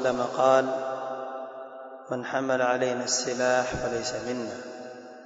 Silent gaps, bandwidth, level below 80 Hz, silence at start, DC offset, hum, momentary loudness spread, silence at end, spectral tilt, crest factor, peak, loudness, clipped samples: none; 8 kHz; -58 dBFS; 0 s; under 0.1%; none; 18 LU; 0 s; -3 dB/octave; 18 dB; -8 dBFS; -27 LUFS; under 0.1%